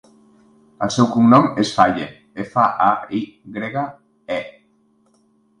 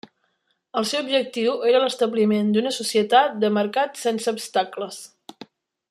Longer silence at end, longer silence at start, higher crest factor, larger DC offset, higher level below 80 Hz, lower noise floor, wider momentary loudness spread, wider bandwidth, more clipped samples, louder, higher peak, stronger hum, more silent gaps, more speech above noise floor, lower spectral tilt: first, 1.1 s vs 0.45 s; about the same, 0.8 s vs 0.75 s; about the same, 20 dB vs 18 dB; neither; first, -56 dBFS vs -74 dBFS; second, -59 dBFS vs -71 dBFS; first, 18 LU vs 11 LU; second, 10.5 kHz vs 14 kHz; neither; first, -18 LUFS vs -22 LUFS; first, 0 dBFS vs -4 dBFS; neither; neither; second, 42 dB vs 49 dB; first, -6 dB/octave vs -4 dB/octave